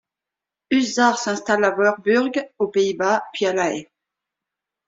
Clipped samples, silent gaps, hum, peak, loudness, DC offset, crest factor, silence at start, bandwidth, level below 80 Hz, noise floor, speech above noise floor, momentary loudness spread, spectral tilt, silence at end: under 0.1%; none; none; -4 dBFS; -20 LUFS; under 0.1%; 18 dB; 0.7 s; 7.8 kHz; -66 dBFS; -87 dBFS; 67 dB; 7 LU; -3.5 dB/octave; 1.05 s